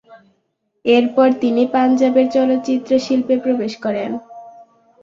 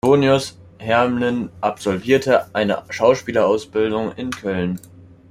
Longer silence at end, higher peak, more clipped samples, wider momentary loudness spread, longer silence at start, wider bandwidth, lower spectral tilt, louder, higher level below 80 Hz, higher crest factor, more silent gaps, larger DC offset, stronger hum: second, 0.4 s vs 0.55 s; about the same, -2 dBFS vs -2 dBFS; neither; about the same, 9 LU vs 10 LU; about the same, 0.1 s vs 0.05 s; second, 7.4 kHz vs 15.5 kHz; about the same, -5.5 dB/octave vs -5.5 dB/octave; first, -16 LUFS vs -19 LUFS; second, -62 dBFS vs -54 dBFS; about the same, 14 dB vs 16 dB; neither; neither; neither